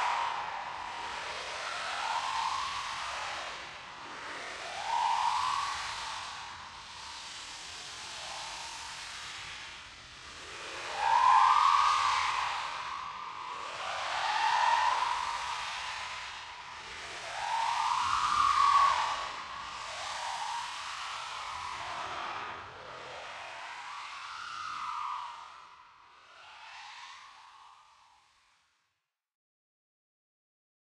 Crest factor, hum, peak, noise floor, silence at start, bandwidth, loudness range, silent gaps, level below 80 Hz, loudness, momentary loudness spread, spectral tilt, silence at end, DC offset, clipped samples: 22 dB; none; -12 dBFS; -84 dBFS; 0 s; 12.5 kHz; 14 LU; none; -66 dBFS; -32 LUFS; 18 LU; 0 dB/octave; 3 s; under 0.1%; under 0.1%